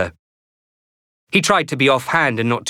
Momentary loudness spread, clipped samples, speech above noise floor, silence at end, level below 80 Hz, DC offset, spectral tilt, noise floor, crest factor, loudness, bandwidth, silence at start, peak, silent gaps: 4 LU; under 0.1%; over 73 dB; 0 s; -58 dBFS; under 0.1%; -4 dB/octave; under -90 dBFS; 18 dB; -17 LUFS; 17.5 kHz; 0 s; -2 dBFS; 0.19-1.27 s